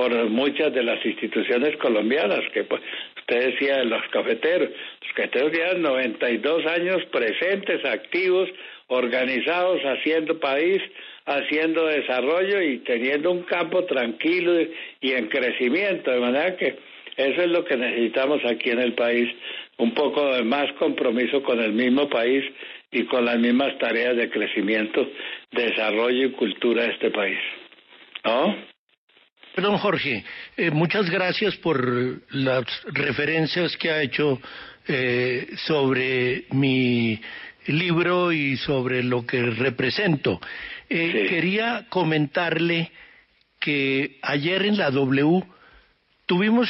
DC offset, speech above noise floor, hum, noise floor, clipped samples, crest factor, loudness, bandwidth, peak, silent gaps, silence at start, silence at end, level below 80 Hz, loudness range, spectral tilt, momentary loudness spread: under 0.1%; 38 dB; none; -61 dBFS; under 0.1%; 14 dB; -23 LUFS; 6 kHz; -10 dBFS; 28.78-28.87 s, 28.98-29.08 s, 29.32-29.36 s; 0 s; 0 s; -66 dBFS; 2 LU; -3.5 dB/octave; 7 LU